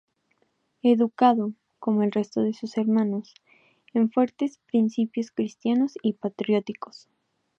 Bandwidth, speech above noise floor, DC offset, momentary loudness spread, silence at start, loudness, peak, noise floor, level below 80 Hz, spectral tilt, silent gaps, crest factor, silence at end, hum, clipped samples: 7.2 kHz; 47 dB; under 0.1%; 10 LU; 0.85 s; -25 LUFS; -6 dBFS; -71 dBFS; -78 dBFS; -7.5 dB/octave; none; 18 dB; 0.75 s; none; under 0.1%